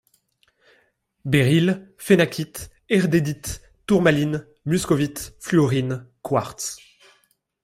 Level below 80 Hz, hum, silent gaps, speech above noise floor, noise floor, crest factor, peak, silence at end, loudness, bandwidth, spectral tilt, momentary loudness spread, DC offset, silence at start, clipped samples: -50 dBFS; none; none; 44 dB; -65 dBFS; 18 dB; -4 dBFS; 0.85 s; -22 LUFS; 16 kHz; -6 dB/octave; 15 LU; under 0.1%; 1.25 s; under 0.1%